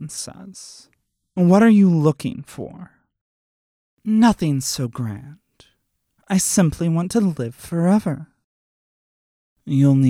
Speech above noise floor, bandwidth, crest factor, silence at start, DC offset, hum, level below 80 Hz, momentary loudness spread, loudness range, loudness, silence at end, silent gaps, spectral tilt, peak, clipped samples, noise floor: 51 dB; 16 kHz; 18 dB; 0 s; under 0.1%; none; -50 dBFS; 20 LU; 4 LU; -18 LUFS; 0 s; 3.21-3.97 s, 8.44-9.56 s; -6 dB/octave; -2 dBFS; under 0.1%; -69 dBFS